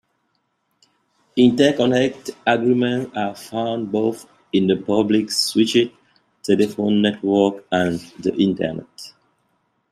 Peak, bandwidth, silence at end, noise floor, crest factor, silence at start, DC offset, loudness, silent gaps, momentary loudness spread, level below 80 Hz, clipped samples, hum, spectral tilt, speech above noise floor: -2 dBFS; 14.5 kHz; 0.8 s; -70 dBFS; 18 dB; 1.35 s; under 0.1%; -19 LUFS; none; 10 LU; -60 dBFS; under 0.1%; none; -5 dB/octave; 51 dB